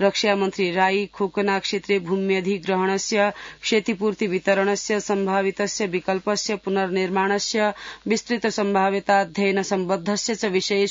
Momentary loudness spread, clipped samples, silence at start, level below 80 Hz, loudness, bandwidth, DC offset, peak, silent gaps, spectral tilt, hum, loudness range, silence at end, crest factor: 4 LU; under 0.1%; 0 s; -60 dBFS; -22 LUFS; 7.8 kHz; under 0.1%; -6 dBFS; none; -4 dB/octave; none; 1 LU; 0 s; 16 dB